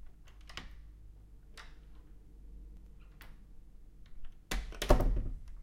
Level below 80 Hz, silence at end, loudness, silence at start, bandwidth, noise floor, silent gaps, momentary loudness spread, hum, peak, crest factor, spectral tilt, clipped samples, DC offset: -40 dBFS; 0 s; -36 LUFS; 0 s; 16 kHz; -54 dBFS; none; 28 LU; none; -10 dBFS; 28 dB; -5.5 dB/octave; under 0.1%; under 0.1%